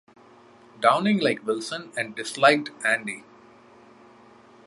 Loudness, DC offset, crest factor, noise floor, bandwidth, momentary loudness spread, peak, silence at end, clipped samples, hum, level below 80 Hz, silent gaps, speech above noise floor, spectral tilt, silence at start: -23 LUFS; under 0.1%; 24 dB; -52 dBFS; 11.5 kHz; 12 LU; -2 dBFS; 1.45 s; under 0.1%; none; -74 dBFS; none; 29 dB; -4 dB/octave; 0.8 s